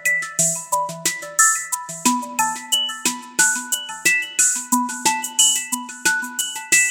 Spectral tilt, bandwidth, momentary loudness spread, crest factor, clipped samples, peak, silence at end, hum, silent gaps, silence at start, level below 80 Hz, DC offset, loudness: 0.5 dB/octave; over 20 kHz; 8 LU; 20 dB; under 0.1%; 0 dBFS; 0 s; none; none; 0 s; -70 dBFS; under 0.1%; -18 LUFS